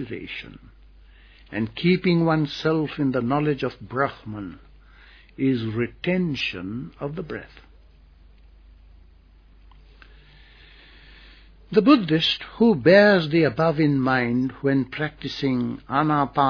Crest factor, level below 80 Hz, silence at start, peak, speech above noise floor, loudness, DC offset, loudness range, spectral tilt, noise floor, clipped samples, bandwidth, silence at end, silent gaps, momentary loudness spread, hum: 20 dB; -50 dBFS; 0 s; -4 dBFS; 30 dB; -22 LUFS; under 0.1%; 12 LU; -7.5 dB/octave; -52 dBFS; under 0.1%; 5.4 kHz; 0 s; none; 16 LU; none